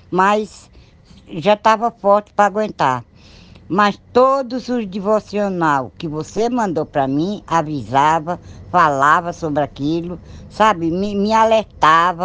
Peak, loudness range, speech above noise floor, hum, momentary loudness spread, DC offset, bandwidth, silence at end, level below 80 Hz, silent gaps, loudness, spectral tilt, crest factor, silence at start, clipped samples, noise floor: 0 dBFS; 2 LU; 28 dB; none; 10 LU; under 0.1%; 9.8 kHz; 0 s; -48 dBFS; none; -17 LUFS; -5.5 dB/octave; 18 dB; 0.1 s; under 0.1%; -45 dBFS